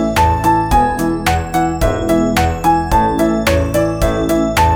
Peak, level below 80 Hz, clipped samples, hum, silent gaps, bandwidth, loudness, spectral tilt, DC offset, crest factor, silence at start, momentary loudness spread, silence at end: 0 dBFS; -24 dBFS; under 0.1%; none; none; over 20 kHz; -14 LUFS; -5.5 dB/octave; under 0.1%; 14 dB; 0 s; 3 LU; 0 s